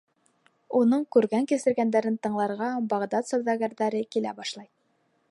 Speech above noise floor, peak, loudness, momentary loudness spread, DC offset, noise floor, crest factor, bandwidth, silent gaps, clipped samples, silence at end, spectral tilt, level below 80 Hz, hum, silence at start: 45 dB; -8 dBFS; -26 LUFS; 7 LU; under 0.1%; -70 dBFS; 18 dB; 11.5 kHz; none; under 0.1%; 0.65 s; -5.5 dB/octave; -76 dBFS; none; 0.7 s